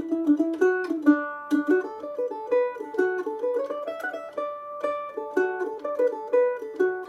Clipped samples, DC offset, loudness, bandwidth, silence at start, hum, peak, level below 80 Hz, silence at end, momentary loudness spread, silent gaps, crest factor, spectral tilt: under 0.1%; under 0.1%; -26 LUFS; 12.5 kHz; 0 s; none; -8 dBFS; -76 dBFS; 0 s; 10 LU; none; 18 dB; -5.5 dB/octave